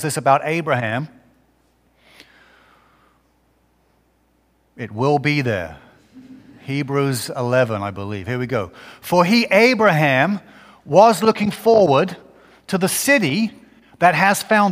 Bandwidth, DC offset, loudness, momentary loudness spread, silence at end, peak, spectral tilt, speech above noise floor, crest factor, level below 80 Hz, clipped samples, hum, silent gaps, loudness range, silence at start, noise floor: 16 kHz; under 0.1%; -17 LUFS; 14 LU; 0 s; 0 dBFS; -5 dB/octave; 44 dB; 18 dB; -58 dBFS; under 0.1%; none; none; 9 LU; 0 s; -61 dBFS